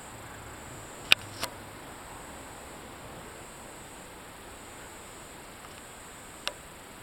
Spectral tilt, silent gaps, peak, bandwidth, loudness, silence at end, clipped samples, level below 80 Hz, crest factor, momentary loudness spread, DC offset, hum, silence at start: -1.5 dB/octave; none; 0 dBFS; 19 kHz; -36 LUFS; 0 s; under 0.1%; -58 dBFS; 38 dB; 17 LU; under 0.1%; none; 0 s